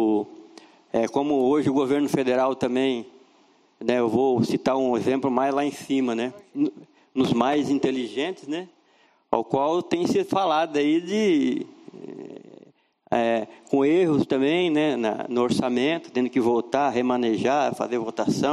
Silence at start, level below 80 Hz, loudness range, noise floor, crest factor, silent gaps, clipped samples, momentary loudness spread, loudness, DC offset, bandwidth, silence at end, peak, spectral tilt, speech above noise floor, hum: 0 s; -64 dBFS; 3 LU; -61 dBFS; 20 dB; none; under 0.1%; 9 LU; -24 LUFS; under 0.1%; 13 kHz; 0 s; -4 dBFS; -6 dB/octave; 38 dB; none